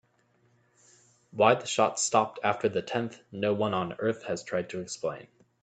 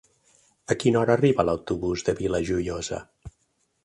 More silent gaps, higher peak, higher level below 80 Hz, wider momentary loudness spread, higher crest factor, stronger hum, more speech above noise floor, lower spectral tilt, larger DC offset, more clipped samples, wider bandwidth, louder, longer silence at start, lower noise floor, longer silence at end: neither; about the same, -6 dBFS vs -6 dBFS; second, -70 dBFS vs -48 dBFS; about the same, 12 LU vs 12 LU; first, 24 dB vs 18 dB; neither; second, 39 dB vs 47 dB; second, -4 dB/octave vs -6 dB/octave; neither; neither; second, 9.2 kHz vs 11.5 kHz; second, -29 LUFS vs -24 LUFS; first, 1.35 s vs 0.7 s; about the same, -68 dBFS vs -71 dBFS; second, 0.35 s vs 0.55 s